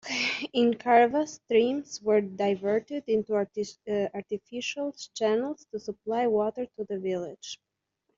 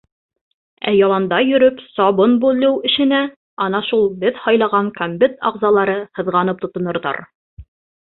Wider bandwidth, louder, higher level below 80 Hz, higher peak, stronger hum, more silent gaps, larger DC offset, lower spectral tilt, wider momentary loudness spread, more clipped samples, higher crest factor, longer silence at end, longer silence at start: first, 7.6 kHz vs 4.3 kHz; second, -28 LUFS vs -16 LUFS; second, -70 dBFS vs -54 dBFS; second, -8 dBFS vs -2 dBFS; neither; second, none vs 3.36-3.57 s, 7.35-7.57 s; neither; second, -3 dB/octave vs -10.5 dB/octave; first, 12 LU vs 9 LU; neither; about the same, 20 dB vs 16 dB; first, 0.6 s vs 0.4 s; second, 0.05 s vs 0.85 s